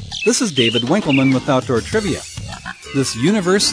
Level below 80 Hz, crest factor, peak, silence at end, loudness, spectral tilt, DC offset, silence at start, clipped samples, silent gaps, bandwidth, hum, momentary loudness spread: -42 dBFS; 14 dB; -2 dBFS; 0 s; -17 LUFS; -4 dB/octave; under 0.1%; 0 s; under 0.1%; none; 11 kHz; none; 13 LU